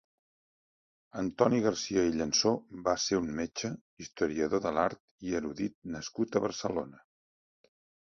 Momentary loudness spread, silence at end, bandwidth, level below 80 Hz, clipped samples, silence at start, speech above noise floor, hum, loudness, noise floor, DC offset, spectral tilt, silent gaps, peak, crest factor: 12 LU; 1.15 s; 7.6 kHz; -60 dBFS; under 0.1%; 1.15 s; over 59 dB; none; -31 LUFS; under -90 dBFS; under 0.1%; -4 dB/octave; 3.81-3.97 s, 5.00-5.18 s, 5.75-5.82 s; -10 dBFS; 24 dB